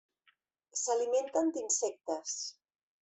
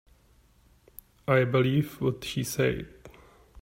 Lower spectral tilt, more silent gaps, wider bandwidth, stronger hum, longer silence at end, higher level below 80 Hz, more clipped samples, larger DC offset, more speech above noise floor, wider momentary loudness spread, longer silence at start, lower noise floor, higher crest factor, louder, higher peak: second, -0.5 dB/octave vs -6 dB/octave; neither; second, 8.4 kHz vs 16 kHz; neither; first, 0.5 s vs 0 s; second, -82 dBFS vs -54 dBFS; neither; neither; first, 40 dB vs 35 dB; second, 9 LU vs 14 LU; second, 0.75 s vs 1.3 s; first, -73 dBFS vs -61 dBFS; about the same, 16 dB vs 20 dB; second, -34 LUFS vs -27 LUFS; second, -18 dBFS vs -10 dBFS